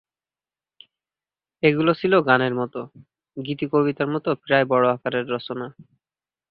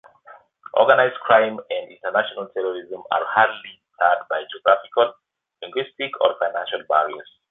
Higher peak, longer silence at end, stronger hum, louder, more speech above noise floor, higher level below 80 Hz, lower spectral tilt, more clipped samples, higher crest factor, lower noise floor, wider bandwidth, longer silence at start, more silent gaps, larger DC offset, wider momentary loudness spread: about the same, 0 dBFS vs 0 dBFS; first, 0.7 s vs 0.3 s; neither; about the same, -21 LUFS vs -21 LUFS; first, over 69 dB vs 28 dB; first, -64 dBFS vs -70 dBFS; first, -10 dB/octave vs -6.5 dB/octave; neither; about the same, 22 dB vs 22 dB; first, under -90 dBFS vs -49 dBFS; first, 5.2 kHz vs 4 kHz; first, 1.65 s vs 0.3 s; neither; neither; first, 17 LU vs 13 LU